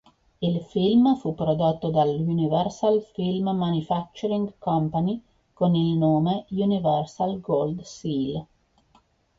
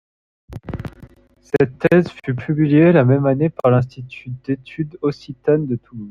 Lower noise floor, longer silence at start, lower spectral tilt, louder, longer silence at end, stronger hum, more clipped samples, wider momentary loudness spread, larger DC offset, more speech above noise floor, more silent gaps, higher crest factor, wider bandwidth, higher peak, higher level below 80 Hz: first, -62 dBFS vs -45 dBFS; about the same, 0.4 s vs 0.5 s; about the same, -8.5 dB/octave vs -9.5 dB/octave; second, -24 LUFS vs -18 LUFS; first, 0.95 s vs 0 s; neither; neither; second, 7 LU vs 19 LU; neither; first, 39 dB vs 28 dB; neither; about the same, 14 dB vs 16 dB; about the same, 7.6 kHz vs 7 kHz; second, -10 dBFS vs -2 dBFS; second, -56 dBFS vs -48 dBFS